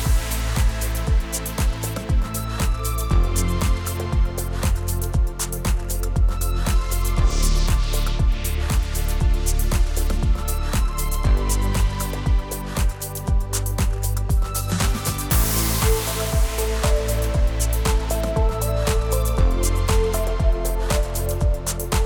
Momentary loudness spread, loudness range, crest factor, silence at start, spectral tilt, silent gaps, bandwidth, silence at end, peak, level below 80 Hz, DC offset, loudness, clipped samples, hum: 4 LU; 2 LU; 14 dB; 0 s; -4.5 dB/octave; none; over 20 kHz; 0 s; -6 dBFS; -22 dBFS; under 0.1%; -23 LUFS; under 0.1%; none